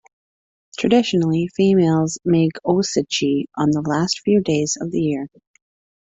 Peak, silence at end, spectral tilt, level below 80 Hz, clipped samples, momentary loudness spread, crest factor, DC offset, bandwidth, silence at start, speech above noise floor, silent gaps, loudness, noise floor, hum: -4 dBFS; 0.75 s; -5.5 dB/octave; -56 dBFS; under 0.1%; 6 LU; 16 dB; under 0.1%; 8.2 kHz; 0.75 s; over 72 dB; none; -19 LUFS; under -90 dBFS; none